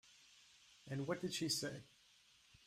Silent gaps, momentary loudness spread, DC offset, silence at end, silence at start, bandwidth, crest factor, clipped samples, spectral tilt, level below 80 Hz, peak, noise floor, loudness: none; 24 LU; under 0.1%; 0.8 s; 0.05 s; 15.5 kHz; 20 dB; under 0.1%; -3.5 dB/octave; -80 dBFS; -26 dBFS; -70 dBFS; -42 LUFS